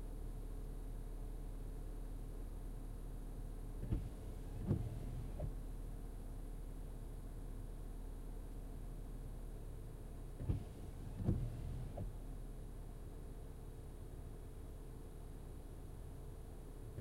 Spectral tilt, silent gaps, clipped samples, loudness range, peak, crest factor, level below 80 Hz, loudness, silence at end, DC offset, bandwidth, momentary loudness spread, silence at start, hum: -7.5 dB/octave; none; under 0.1%; 7 LU; -24 dBFS; 22 dB; -48 dBFS; -50 LUFS; 0 s; under 0.1%; 15.5 kHz; 10 LU; 0 s; none